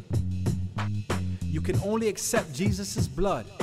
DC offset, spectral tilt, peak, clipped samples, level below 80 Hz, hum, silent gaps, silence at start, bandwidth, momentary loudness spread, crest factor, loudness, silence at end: under 0.1%; -5.5 dB/octave; -12 dBFS; under 0.1%; -42 dBFS; none; none; 0 s; 15.5 kHz; 5 LU; 16 dB; -29 LUFS; 0 s